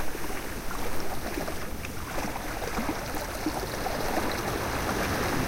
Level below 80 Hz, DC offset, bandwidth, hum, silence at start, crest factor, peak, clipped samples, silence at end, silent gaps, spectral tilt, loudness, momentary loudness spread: -40 dBFS; under 0.1%; 16.5 kHz; none; 0 s; 14 dB; -14 dBFS; under 0.1%; 0 s; none; -4 dB/octave; -32 LUFS; 6 LU